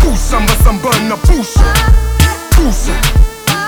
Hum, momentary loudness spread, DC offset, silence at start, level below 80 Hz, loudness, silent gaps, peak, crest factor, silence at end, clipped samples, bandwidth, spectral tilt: none; 3 LU; under 0.1%; 0 s; -10 dBFS; -12 LUFS; none; 0 dBFS; 10 dB; 0 s; 0.9%; over 20 kHz; -4.5 dB/octave